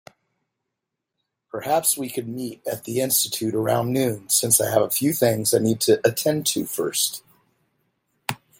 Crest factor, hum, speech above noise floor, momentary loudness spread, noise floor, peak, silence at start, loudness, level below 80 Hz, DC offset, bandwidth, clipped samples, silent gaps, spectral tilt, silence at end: 20 dB; none; 60 dB; 14 LU; -82 dBFS; -4 dBFS; 1.55 s; -21 LUFS; -66 dBFS; under 0.1%; 17 kHz; under 0.1%; none; -3.5 dB/octave; 0.25 s